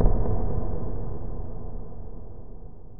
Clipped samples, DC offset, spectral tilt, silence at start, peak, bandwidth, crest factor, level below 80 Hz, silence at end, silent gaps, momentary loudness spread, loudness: under 0.1%; under 0.1%; -13.5 dB/octave; 0 s; -6 dBFS; 2 kHz; 18 dB; -30 dBFS; 0 s; none; 17 LU; -33 LUFS